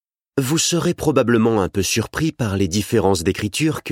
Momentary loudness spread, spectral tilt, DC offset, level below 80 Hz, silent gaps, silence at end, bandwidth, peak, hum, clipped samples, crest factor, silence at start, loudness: 5 LU; -4.5 dB/octave; under 0.1%; -44 dBFS; none; 0 s; 16.5 kHz; -2 dBFS; none; under 0.1%; 18 dB; 0.35 s; -19 LUFS